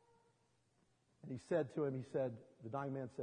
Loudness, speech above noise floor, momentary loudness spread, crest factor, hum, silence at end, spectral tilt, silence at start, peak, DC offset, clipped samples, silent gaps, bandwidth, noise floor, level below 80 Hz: -43 LUFS; 36 dB; 12 LU; 18 dB; none; 0 s; -8 dB/octave; 1.25 s; -26 dBFS; under 0.1%; under 0.1%; none; 10 kHz; -78 dBFS; -84 dBFS